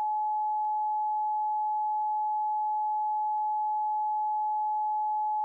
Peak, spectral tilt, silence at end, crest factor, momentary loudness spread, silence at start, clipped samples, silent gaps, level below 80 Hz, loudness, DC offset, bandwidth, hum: -26 dBFS; 5.5 dB/octave; 0 s; 4 dB; 0 LU; 0 s; under 0.1%; none; under -90 dBFS; -29 LUFS; under 0.1%; 1.1 kHz; none